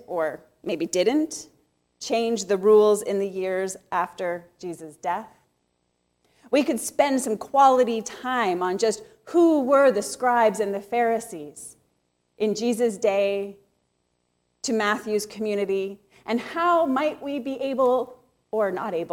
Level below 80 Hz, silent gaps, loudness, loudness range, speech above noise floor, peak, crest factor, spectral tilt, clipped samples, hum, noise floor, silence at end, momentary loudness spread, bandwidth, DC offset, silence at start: -70 dBFS; none; -23 LUFS; 7 LU; 49 dB; -6 dBFS; 18 dB; -4 dB/octave; under 0.1%; none; -73 dBFS; 0 s; 16 LU; 16.5 kHz; under 0.1%; 0.1 s